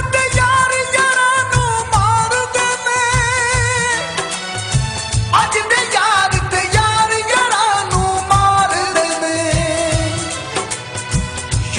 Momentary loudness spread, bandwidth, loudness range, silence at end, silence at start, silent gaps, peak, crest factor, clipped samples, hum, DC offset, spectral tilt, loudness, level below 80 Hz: 8 LU; 11.5 kHz; 2 LU; 0 s; 0 s; none; -2 dBFS; 12 dB; under 0.1%; none; under 0.1%; -3 dB/octave; -15 LUFS; -30 dBFS